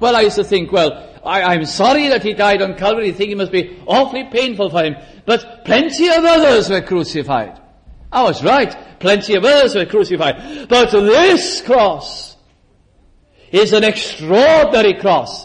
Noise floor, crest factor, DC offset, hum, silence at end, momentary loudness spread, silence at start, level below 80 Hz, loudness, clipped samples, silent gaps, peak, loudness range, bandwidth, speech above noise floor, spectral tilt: -53 dBFS; 12 dB; under 0.1%; none; 0 s; 10 LU; 0 s; -44 dBFS; -13 LUFS; under 0.1%; none; -2 dBFS; 3 LU; 10.5 kHz; 39 dB; -4 dB/octave